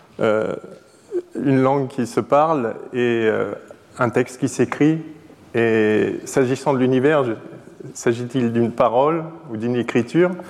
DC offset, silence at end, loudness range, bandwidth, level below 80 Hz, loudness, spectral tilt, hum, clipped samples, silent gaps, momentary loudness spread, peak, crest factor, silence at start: under 0.1%; 0 s; 2 LU; 13.5 kHz; -64 dBFS; -20 LUFS; -6.5 dB/octave; none; under 0.1%; none; 12 LU; -4 dBFS; 16 dB; 0.2 s